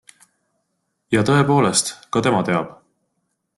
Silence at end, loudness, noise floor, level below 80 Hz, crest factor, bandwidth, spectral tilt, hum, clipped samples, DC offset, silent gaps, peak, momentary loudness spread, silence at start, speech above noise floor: 0.85 s; -18 LUFS; -73 dBFS; -56 dBFS; 18 dB; 12.5 kHz; -4.5 dB/octave; none; under 0.1%; under 0.1%; none; -2 dBFS; 7 LU; 1.1 s; 55 dB